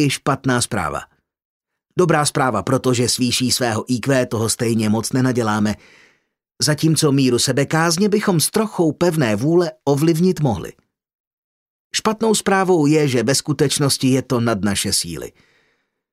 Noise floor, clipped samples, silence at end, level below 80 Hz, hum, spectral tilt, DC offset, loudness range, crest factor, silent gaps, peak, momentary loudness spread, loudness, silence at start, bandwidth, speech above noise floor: -66 dBFS; under 0.1%; 0.85 s; -52 dBFS; none; -4.5 dB/octave; under 0.1%; 3 LU; 16 dB; 1.45-1.61 s, 11.15-11.90 s; -4 dBFS; 6 LU; -18 LUFS; 0 s; 16 kHz; 49 dB